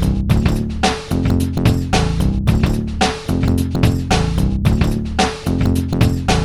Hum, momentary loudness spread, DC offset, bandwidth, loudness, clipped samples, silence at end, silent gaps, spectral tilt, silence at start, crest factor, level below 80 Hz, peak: none; 2 LU; under 0.1%; 15 kHz; -17 LUFS; under 0.1%; 0 s; none; -6 dB/octave; 0 s; 12 dB; -22 dBFS; -4 dBFS